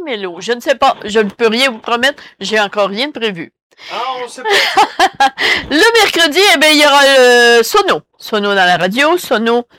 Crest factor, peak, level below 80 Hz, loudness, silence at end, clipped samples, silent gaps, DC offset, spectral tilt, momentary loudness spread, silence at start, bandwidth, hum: 10 dB; -2 dBFS; -50 dBFS; -11 LUFS; 0.15 s; under 0.1%; 3.62-3.70 s; under 0.1%; -2 dB/octave; 14 LU; 0 s; 17 kHz; none